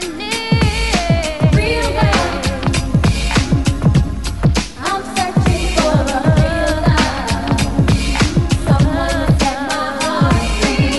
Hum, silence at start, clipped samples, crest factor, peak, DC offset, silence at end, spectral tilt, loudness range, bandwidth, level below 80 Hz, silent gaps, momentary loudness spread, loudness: none; 0 s; under 0.1%; 14 dB; 0 dBFS; 1%; 0 s; -5.5 dB/octave; 1 LU; 12 kHz; -22 dBFS; none; 4 LU; -15 LUFS